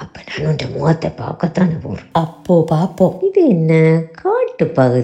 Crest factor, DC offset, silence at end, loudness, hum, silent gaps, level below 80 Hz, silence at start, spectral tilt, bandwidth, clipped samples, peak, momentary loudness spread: 14 dB; under 0.1%; 0 s; -16 LUFS; none; none; -48 dBFS; 0 s; -8.5 dB/octave; 8.4 kHz; under 0.1%; 0 dBFS; 9 LU